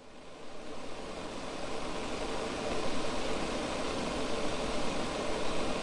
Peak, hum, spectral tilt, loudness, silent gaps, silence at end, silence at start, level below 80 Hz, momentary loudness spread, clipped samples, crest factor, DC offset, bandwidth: -18 dBFS; none; -4 dB/octave; -36 LUFS; none; 0 s; 0 s; -48 dBFS; 10 LU; under 0.1%; 16 dB; under 0.1%; 11.5 kHz